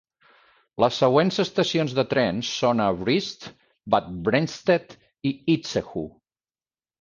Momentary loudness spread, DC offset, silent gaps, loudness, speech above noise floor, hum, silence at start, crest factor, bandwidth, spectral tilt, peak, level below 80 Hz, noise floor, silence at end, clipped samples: 13 LU; under 0.1%; none; -23 LUFS; over 67 dB; none; 0.8 s; 20 dB; 9.8 kHz; -5.5 dB/octave; -4 dBFS; -56 dBFS; under -90 dBFS; 0.9 s; under 0.1%